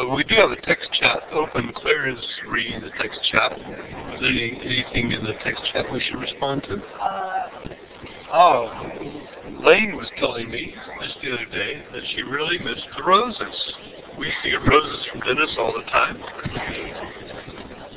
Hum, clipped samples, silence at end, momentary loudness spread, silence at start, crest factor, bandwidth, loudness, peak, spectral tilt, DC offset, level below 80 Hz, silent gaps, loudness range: none; under 0.1%; 0 s; 18 LU; 0 s; 22 dB; 4 kHz; -21 LUFS; 0 dBFS; -8 dB/octave; under 0.1%; -46 dBFS; none; 4 LU